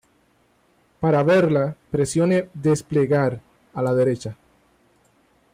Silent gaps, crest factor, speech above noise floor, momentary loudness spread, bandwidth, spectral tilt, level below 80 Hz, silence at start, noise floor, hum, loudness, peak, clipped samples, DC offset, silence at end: none; 14 dB; 42 dB; 11 LU; 15 kHz; -7 dB/octave; -56 dBFS; 1 s; -61 dBFS; none; -21 LUFS; -8 dBFS; under 0.1%; under 0.1%; 1.2 s